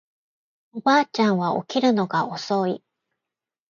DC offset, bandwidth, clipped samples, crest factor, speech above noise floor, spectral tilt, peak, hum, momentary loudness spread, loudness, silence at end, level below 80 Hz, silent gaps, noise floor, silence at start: under 0.1%; 7.4 kHz; under 0.1%; 18 dB; 66 dB; -5.5 dB/octave; -6 dBFS; none; 8 LU; -22 LUFS; 0.9 s; -72 dBFS; none; -88 dBFS; 0.75 s